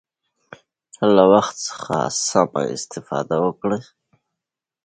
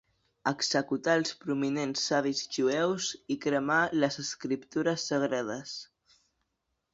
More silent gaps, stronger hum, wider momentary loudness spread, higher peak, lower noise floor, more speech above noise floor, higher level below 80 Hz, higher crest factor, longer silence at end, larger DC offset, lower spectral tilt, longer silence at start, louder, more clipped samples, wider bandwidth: neither; neither; first, 13 LU vs 8 LU; first, 0 dBFS vs -12 dBFS; about the same, -85 dBFS vs -82 dBFS; first, 66 dB vs 52 dB; first, -60 dBFS vs -72 dBFS; about the same, 20 dB vs 20 dB; about the same, 1.05 s vs 1.1 s; neither; about the same, -4.5 dB/octave vs -3.5 dB/octave; first, 1 s vs 0.45 s; first, -19 LUFS vs -30 LUFS; neither; first, 9.6 kHz vs 7.8 kHz